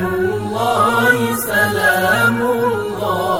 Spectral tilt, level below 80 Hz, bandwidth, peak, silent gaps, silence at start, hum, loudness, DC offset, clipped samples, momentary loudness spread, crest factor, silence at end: -4.5 dB/octave; -48 dBFS; 16.5 kHz; 0 dBFS; none; 0 s; none; -15 LUFS; under 0.1%; under 0.1%; 6 LU; 14 dB; 0 s